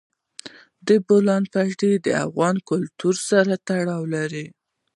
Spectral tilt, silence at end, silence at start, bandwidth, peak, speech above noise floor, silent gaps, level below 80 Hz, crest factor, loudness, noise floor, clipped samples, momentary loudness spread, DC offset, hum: -5.5 dB/octave; 0.45 s; 0.45 s; 11.5 kHz; -4 dBFS; 23 dB; none; -68 dBFS; 18 dB; -21 LUFS; -43 dBFS; under 0.1%; 16 LU; under 0.1%; none